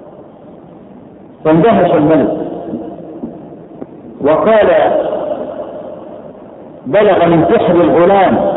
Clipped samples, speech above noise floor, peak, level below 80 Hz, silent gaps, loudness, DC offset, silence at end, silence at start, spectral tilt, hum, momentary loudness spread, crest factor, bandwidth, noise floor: under 0.1%; 26 dB; -2 dBFS; -44 dBFS; none; -11 LUFS; under 0.1%; 0 s; 0 s; -11.5 dB/octave; none; 22 LU; 10 dB; 4.1 kHz; -35 dBFS